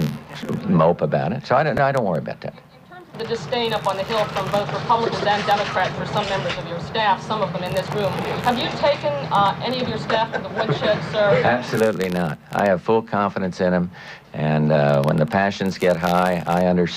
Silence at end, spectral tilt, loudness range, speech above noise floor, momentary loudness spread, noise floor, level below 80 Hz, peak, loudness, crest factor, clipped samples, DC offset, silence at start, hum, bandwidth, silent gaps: 0 s; -6 dB/octave; 3 LU; 22 dB; 8 LU; -42 dBFS; -52 dBFS; -4 dBFS; -21 LUFS; 16 dB; under 0.1%; under 0.1%; 0 s; none; 15.5 kHz; none